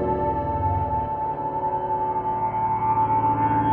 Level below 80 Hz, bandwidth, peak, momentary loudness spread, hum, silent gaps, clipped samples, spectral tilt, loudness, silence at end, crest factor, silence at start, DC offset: -42 dBFS; 3.5 kHz; -10 dBFS; 5 LU; none; none; under 0.1%; -11 dB/octave; -24 LUFS; 0 s; 12 dB; 0 s; under 0.1%